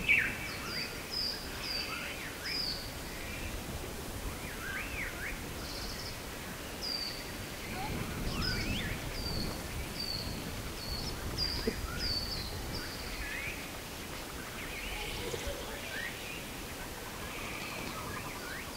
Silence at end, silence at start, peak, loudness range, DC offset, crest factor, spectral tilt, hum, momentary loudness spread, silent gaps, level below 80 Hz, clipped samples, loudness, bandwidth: 0 s; 0 s; -16 dBFS; 3 LU; under 0.1%; 22 dB; -3 dB/octave; none; 7 LU; none; -46 dBFS; under 0.1%; -37 LUFS; 16 kHz